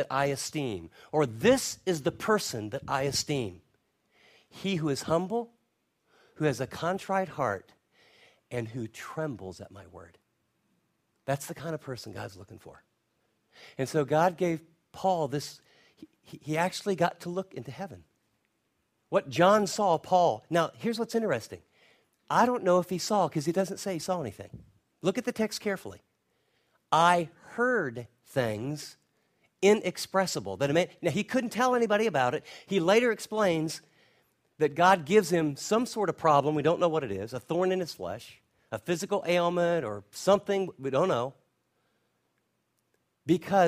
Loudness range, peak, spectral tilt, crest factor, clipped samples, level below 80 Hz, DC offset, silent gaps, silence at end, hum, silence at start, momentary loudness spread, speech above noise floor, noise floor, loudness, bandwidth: 9 LU; -8 dBFS; -5 dB/octave; 22 dB; under 0.1%; -66 dBFS; under 0.1%; none; 0 s; none; 0 s; 15 LU; 48 dB; -77 dBFS; -29 LUFS; 15.5 kHz